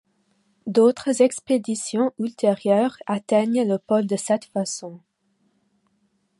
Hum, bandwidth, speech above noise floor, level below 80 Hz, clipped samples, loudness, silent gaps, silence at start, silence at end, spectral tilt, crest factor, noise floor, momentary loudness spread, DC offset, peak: none; 11.5 kHz; 47 dB; -72 dBFS; under 0.1%; -22 LUFS; none; 0.65 s; 1.4 s; -5 dB/octave; 18 dB; -68 dBFS; 9 LU; under 0.1%; -6 dBFS